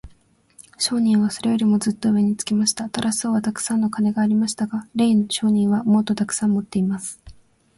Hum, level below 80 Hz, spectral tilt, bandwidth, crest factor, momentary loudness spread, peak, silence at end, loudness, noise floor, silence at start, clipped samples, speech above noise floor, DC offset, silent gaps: none; -56 dBFS; -4.5 dB/octave; 11.5 kHz; 16 dB; 5 LU; -4 dBFS; 0.45 s; -20 LUFS; -55 dBFS; 0.05 s; under 0.1%; 35 dB; under 0.1%; none